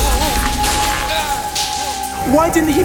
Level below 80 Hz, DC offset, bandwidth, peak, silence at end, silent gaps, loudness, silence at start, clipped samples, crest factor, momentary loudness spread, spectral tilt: -24 dBFS; under 0.1%; 19.5 kHz; -2 dBFS; 0 s; none; -16 LUFS; 0 s; under 0.1%; 14 dB; 6 LU; -3.5 dB/octave